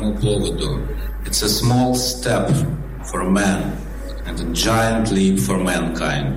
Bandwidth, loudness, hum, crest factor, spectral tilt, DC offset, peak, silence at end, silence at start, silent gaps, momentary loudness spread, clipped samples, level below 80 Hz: 16.5 kHz; -19 LUFS; none; 14 dB; -4.5 dB/octave; 0.4%; -4 dBFS; 0 s; 0 s; none; 11 LU; under 0.1%; -28 dBFS